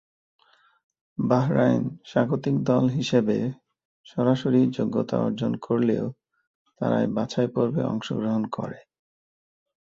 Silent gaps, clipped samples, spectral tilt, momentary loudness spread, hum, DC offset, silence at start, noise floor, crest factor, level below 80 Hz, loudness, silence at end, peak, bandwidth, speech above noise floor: 3.85-4.04 s, 6.47-6.65 s; under 0.1%; -7.5 dB/octave; 9 LU; none; under 0.1%; 1.2 s; under -90 dBFS; 20 dB; -62 dBFS; -25 LUFS; 1.2 s; -6 dBFS; 7.6 kHz; over 67 dB